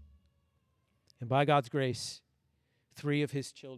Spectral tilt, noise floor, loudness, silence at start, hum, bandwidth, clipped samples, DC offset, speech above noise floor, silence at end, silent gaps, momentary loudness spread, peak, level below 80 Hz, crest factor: -5.5 dB/octave; -76 dBFS; -32 LUFS; 0 s; none; 14 kHz; under 0.1%; under 0.1%; 44 dB; 0 s; none; 15 LU; -16 dBFS; -70 dBFS; 20 dB